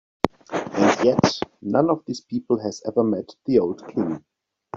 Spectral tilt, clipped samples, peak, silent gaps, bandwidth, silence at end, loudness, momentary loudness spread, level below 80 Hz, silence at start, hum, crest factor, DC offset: -5.5 dB/octave; under 0.1%; 0 dBFS; none; 7.8 kHz; 0 s; -23 LUFS; 11 LU; -56 dBFS; 0.25 s; none; 22 dB; under 0.1%